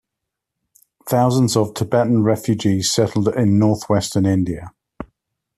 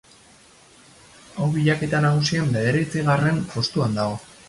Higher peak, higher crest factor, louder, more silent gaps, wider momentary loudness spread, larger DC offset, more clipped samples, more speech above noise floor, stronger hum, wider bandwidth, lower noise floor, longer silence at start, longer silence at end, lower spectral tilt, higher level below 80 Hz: first, -2 dBFS vs -8 dBFS; about the same, 16 dB vs 16 dB; first, -18 LUFS vs -22 LUFS; neither; first, 20 LU vs 6 LU; neither; neither; first, 64 dB vs 30 dB; neither; first, 14 kHz vs 11.5 kHz; first, -81 dBFS vs -51 dBFS; second, 1.05 s vs 1.35 s; first, 0.55 s vs 0.25 s; about the same, -6 dB/octave vs -6 dB/octave; about the same, -52 dBFS vs -52 dBFS